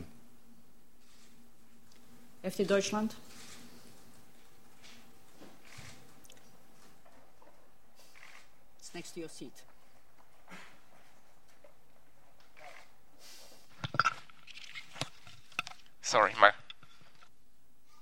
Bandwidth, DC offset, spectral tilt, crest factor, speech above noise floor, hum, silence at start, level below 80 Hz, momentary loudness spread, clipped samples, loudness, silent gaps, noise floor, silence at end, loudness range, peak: 16.5 kHz; 0.5%; -3 dB/octave; 34 dB; 40 dB; none; 0 s; -72 dBFS; 29 LU; under 0.1%; -32 LUFS; none; -71 dBFS; 1.45 s; 25 LU; -4 dBFS